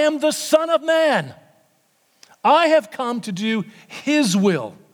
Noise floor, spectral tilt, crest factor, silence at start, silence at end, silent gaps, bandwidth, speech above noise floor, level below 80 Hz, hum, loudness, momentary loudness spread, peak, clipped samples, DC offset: -62 dBFS; -4.5 dB/octave; 18 dB; 0 s; 0.2 s; none; 19.5 kHz; 43 dB; -76 dBFS; none; -19 LUFS; 10 LU; -2 dBFS; under 0.1%; under 0.1%